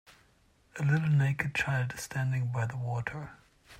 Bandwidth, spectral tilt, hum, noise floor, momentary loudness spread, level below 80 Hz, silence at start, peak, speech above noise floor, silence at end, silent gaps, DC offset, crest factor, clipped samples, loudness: 13.5 kHz; -6 dB/octave; none; -66 dBFS; 13 LU; -60 dBFS; 0.75 s; -16 dBFS; 36 dB; 0 s; none; under 0.1%; 16 dB; under 0.1%; -31 LUFS